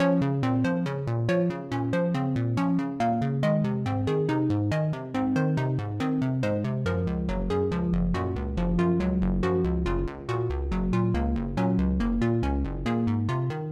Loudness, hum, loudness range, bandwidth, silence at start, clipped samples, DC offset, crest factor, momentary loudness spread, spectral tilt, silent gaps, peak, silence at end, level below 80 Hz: -27 LUFS; none; 1 LU; 9.4 kHz; 0 s; under 0.1%; under 0.1%; 14 dB; 4 LU; -8.5 dB/octave; none; -12 dBFS; 0 s; -36 dBFS